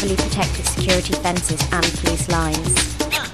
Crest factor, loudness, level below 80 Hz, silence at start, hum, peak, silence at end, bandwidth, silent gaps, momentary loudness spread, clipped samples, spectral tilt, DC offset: 18 dB; -19 LUFS; -28 dBFS; 0 s; none; -2 dBFS; 0 s; 14 kHz; none; 3 LU; under 0.1%; -3.5 dB/octave; 0.7%